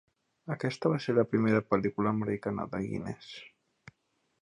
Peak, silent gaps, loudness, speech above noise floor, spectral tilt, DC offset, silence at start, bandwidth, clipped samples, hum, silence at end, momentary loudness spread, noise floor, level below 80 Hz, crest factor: -12 dBFS; none; -31 LUFS; 46 dB; -7.5 dB/octave; under 0.1%; 0.45 s; 10.5 kHz; under 0.1%; none; 0.95 s; 16 LU; -76 dBFS; -64 dBFS; 20 dB